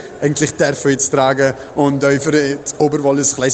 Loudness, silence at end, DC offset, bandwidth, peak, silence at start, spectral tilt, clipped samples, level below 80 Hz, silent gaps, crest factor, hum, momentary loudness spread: -15 LUFS; 0 s; under 0.1%; 9.2 kHz; 0 dBFS; 0 s; -4.5 dB/octave; under 0.1%; -50 dBFS; none; 14 dB; none; 4 LU